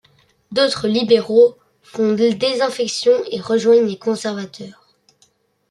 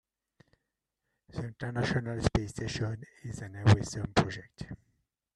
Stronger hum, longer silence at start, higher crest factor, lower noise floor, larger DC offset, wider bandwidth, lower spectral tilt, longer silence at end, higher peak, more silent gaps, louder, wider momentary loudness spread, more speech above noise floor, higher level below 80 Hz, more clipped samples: neither; second, 0.5 s vs 1.35 s; second, 16 dB vs 24 dB; second, -60 dBFS vs -85 dBFS; neither; about the same, 11.5 kHz vs 11 kHz; second, -4.5 dB/octave vs -6 dB/octave; first, 1 s vs 0.6 s; first, -2 dBFS vs -10 dBFS; neither; first, -17 LUFS vs -32 LUFS; second, 14 LU vs 19 LU; second, 43 dB vs 54 dB; second, -62 dBFS vs -50 dBFS; neither